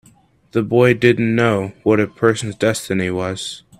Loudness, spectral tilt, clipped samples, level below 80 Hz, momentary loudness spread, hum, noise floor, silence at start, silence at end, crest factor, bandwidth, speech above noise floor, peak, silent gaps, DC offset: -17 LUFS; -6 dB/octave; under 0.1%; -54 dBFS; 9 LU; none; -52 dBFS; 0.55 s; 0.2 s; 18 dB; 14.5 kHz; 36 dB; 0 dBFS; none; under 0.1%